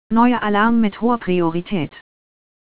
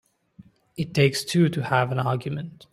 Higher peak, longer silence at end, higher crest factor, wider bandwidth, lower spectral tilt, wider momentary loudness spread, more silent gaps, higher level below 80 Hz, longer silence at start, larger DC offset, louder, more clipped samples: about the same, -2 dBFS vs -4 dBFS; first, 0.7 s vs 0.2 s; about the same, 16 dB vs 20 dB; second, 4 kHz vs 15.5 kHz; first, -10.5 dB/octave vs -6 dB/octave; second, 9 LU vs 12 LU; neither; first, -48 dBFS vs -60 dBFS; second, 0.1 s vs 0.8 s; first, 3% vs under 0.1%; first, -18 LUFS vs -24 LUFS; neither